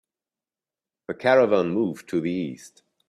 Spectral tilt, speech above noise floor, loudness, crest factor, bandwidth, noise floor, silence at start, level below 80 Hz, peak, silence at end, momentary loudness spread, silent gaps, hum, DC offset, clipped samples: -6.5 dB/octave; over 67 dB; -23 LUFS; 20 dB; 13 kHz; under -90 dBFS; 1.1 s; -68 dBFS; -6 dBFS; 0.4 s; 16 LU; none; none; under 0.1%; under 0.1%